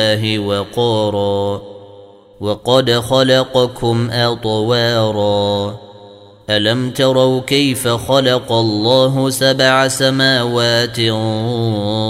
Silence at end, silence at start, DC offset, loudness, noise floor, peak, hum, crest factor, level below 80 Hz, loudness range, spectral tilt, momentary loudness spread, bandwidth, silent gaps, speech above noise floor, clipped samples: 0 s; 0 s; under 0.1%; -14 LUFS; -40 dBFS; 0 dBFS; none; 14 dB; -48 dBFS; 3 LU; -5 dB/octave; 6 LU; 16 kHz; none; 26 dB; under 0.1%